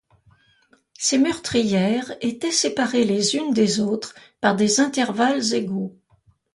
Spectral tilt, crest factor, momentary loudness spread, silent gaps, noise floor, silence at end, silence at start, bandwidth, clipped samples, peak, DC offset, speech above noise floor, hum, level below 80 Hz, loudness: -3.5 dB/octave; 18 dB; 9 LU; none; -60 dBFS; 0.65 s; 1 s; 11.5 kHz; under 0.1%; -4 dBFS; under 0.1%; 39 dB; none; -60 dBFS; -21 LUFS